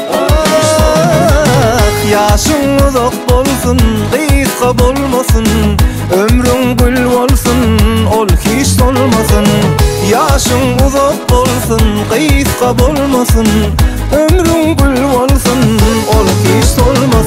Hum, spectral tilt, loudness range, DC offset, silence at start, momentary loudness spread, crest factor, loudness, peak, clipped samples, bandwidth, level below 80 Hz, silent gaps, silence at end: none; -5 dB/octave; 1 LU; 0.3%; 0 s; 2 LU; 8 dB; -9 LUFS; 0 dBFS; under 0.1%; 16.5 kHz; -16 dBFS; none; 0 s